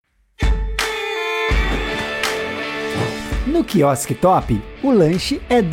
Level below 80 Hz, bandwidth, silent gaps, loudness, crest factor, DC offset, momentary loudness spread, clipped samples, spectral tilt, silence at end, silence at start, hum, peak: -26 dBFS; 16.5 kHz; none; -19 LUFS; 14 dB; under 0.1%; 7 LU; under 0.1%; -5 dB/octave; 0 s; 0.4 s; none; -4 dBFS